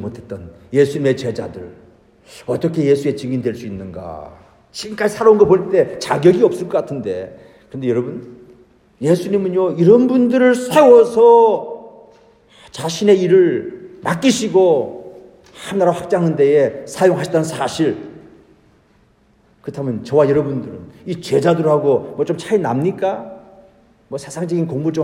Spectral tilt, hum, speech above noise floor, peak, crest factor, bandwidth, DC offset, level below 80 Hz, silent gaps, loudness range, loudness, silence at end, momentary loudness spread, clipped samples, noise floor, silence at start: -6.5 dB/octave; none; 39 dB; 0 dBFS; 16 dB; 15.5 kHz; under 0.1%; -56 dBFS; none; 9 LU; -15 LUFS; 0 s; 20 LU; under 0.1%; -54 dBFS; 0 s